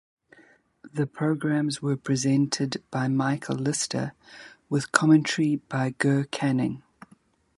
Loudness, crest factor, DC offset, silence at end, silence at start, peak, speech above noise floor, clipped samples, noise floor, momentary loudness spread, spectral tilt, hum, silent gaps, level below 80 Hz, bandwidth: -25 LUFS; 26 dB; under 0.1%; 0.8 s; 0.85 s; 0 dBFS; 35 dB; under 0.1%; -60 dBFS; 11 LU; -5 dB/octave; none; none; -66 dBFS; 11.5 kHz